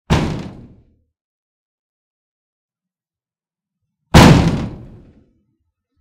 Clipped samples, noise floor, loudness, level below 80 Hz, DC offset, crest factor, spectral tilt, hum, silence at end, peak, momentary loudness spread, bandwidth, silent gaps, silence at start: 0.2%; under -90 dBFS; -12 LUFS; -30 dBFS; under 0.1%; 18 dB; -6 dB/octave; none; 1.25 s; 0 dBFS; 21 LU; 16.5 kHz; 1.21-2.69 s; 0.1 s